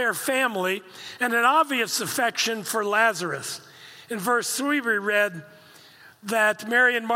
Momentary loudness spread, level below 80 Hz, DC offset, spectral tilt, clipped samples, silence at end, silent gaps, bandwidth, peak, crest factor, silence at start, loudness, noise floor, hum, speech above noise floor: 12 LU; -82 dBFS; under 0.1%; -2 dB/octave; under 0.1%; 0 s; none; 16.5 kHz; -8 dBFS; 18 dB; 0 s; -23 LUFS; -50 dBFS; none; 27 dB